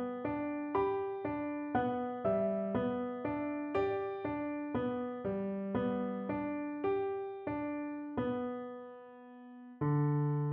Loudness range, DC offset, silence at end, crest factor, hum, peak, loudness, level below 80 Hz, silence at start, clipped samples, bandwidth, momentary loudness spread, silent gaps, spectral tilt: 3 LU; under 0.1%; 0 s; 16 dB; none; -20 dBFS; -36 LUFS; -64 dBFS; 0 s; under 0.1%; 5.2 kHz; 8 LU; none; -8 dB/octave